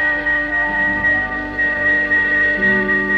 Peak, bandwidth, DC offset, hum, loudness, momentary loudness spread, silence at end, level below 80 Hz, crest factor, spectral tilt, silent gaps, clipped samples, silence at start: -6 dBFS; 8.2 kHz; under 0.1%; none; -15 LUFS; 4 LU; 0 s; -38 dBFS; 10 dB; -6 dB/octave; none; under 0.1%; 0 s